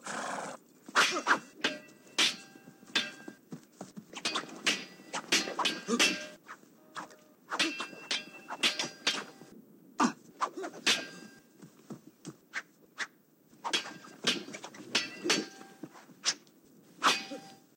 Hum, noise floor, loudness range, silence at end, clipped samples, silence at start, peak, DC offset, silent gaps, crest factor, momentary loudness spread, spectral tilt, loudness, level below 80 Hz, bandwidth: none; -63 dBFS; 5 LU; 0.2 s; under 0.1%; 0 s; -12 dBFS; under 0.1%; none; 24 dB; 22 LU; -1 dB/octave; -32 LUFS; under -90 dBFS; 16.5 kHz